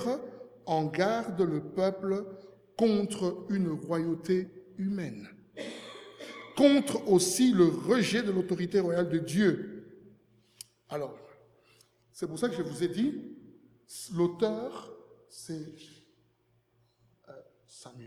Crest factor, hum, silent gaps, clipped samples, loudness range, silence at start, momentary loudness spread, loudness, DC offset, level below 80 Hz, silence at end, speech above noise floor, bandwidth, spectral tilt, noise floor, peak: 22 dB; none; none; under 0.1%; 10 LU; 0 s; 22 LU; -29 LUFS; under 0.1%; -72 dBFS; 0 s; 42 dB; 16 kHz; -5.5 dB/octave; -71 dBFS; -10 dBFS